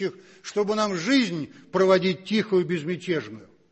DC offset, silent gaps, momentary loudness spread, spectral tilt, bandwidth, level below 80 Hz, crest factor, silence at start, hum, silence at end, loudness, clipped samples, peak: under 0.1%; none; 12 LU; -5.5 dB/octave; 8.4 kHz; -68 dBFS; 18 dB; 0 s; none; 0.25 s; -24 LUFS; under 0.1%; -8 dBFS